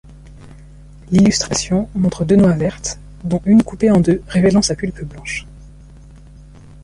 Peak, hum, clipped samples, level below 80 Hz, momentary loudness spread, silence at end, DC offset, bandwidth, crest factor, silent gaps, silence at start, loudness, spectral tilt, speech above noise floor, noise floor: -2 dBFS; none; under 0.1%; -38 dBFS; 13 LU; 1.15 s; under 0.1%; 11 kHz; 14 dB; none; 0.25 s; -16 LUFS; -5.5 dB/octave; 25 dB; -40 dBFS